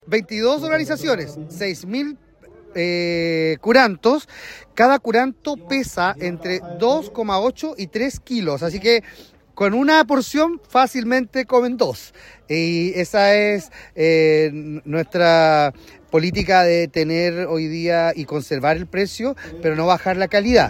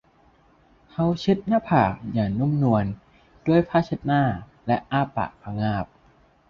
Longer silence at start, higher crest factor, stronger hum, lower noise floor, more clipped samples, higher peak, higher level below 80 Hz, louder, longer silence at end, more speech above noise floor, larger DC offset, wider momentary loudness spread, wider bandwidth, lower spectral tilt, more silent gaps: second, 0.05 s vs 1 s; about the same, 18 dB vs 20 dB; neither; second, -46 dBFS vs -58 dBFS; neither; first, 0 dBFS vs -4 dBFS; about the same, -46 dBFS vs -50 dBFS; first, -19 LUFS vs -24 LUFS; second, 0 s vs 0.65 s; second, 28 dB vs 36 dB; neither; about the same, 11 LU vs 10 LU; first, 16.5 kHz vs 7 kHz; second, -5 dB/octave vs -8.5 dB/octave; neither